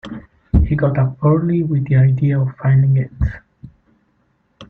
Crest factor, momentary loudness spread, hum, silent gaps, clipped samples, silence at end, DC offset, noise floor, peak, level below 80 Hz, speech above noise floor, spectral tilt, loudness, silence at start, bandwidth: 14 dB; 10 LU; none; none; under 0.1%; 0.05 s; under 0.1%; -62 dBFS; -2 dBFS; -28 dBFS; 47 dB; -11.5 dB/octave; -16 LUFS; 0.05 s; 3.8 kHz